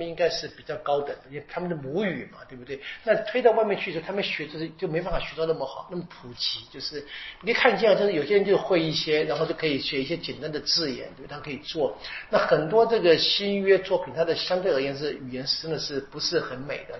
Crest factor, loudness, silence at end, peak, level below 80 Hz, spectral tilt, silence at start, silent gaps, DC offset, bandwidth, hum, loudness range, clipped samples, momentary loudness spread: 22 dB; -25 LUFS; 0 s; -4 dBFS; -50 dBFS; -2.5 dB/octave; 0 s; none; under 0.1%; 6.2 kHz; none; 6 LU; under 0.1%; 15 LU